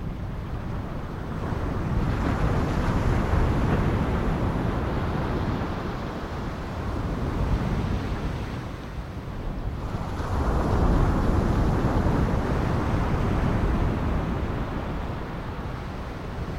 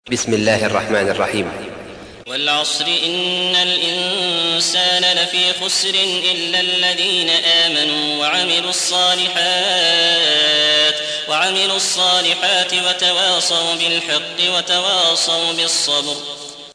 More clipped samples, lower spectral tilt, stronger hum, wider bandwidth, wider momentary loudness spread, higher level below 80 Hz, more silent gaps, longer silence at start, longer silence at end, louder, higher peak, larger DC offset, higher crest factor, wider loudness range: neither; first, -8 dB/octave vs -1 dB/octave; neither; first, 15 kHz vs 11 kHz; first, 10 LU vs 7 LU; first, -30 dBFS vs -58 dBFS; neither; about the same, 0 s vs 0.05 s; about the same, 0 s vs 0 s; second, -27 LUFS vs -14 LUFS; second, -10 dBFS vs -2 dBFS; neither; about the same, 16 dB vs 14 dB; about the same, 5 LU vs 4 LU